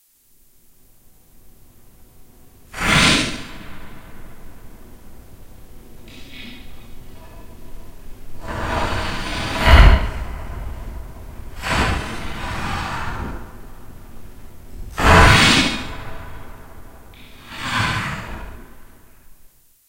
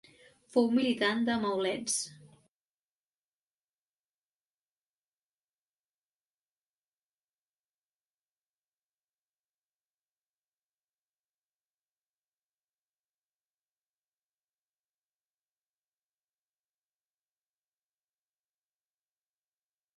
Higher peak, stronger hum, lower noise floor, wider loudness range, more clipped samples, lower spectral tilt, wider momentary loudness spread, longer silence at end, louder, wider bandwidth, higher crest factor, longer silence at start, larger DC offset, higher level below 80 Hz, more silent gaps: first, 0 dBFS vs -14 dBFS; second, none vs 50 Hz at -85 dBFS; second, -54 dBFS vs under -90 dBFS; about the same, 12 LU vs 10 LU; neither; about the same, -4 dB/octave vs -3 dB/octave; first, 27 LU vs 5 LU; second, 0.4 s vs 17.85 s; first, -17 LUFS vs -30 LUFS; first, 16 kHz vs 11.5 kHz; about the same, 22 dB vs 26 dB; first, 1.45 s vs 0.55 s; neither; first, -26 dBFS vs -80 dBFS; neither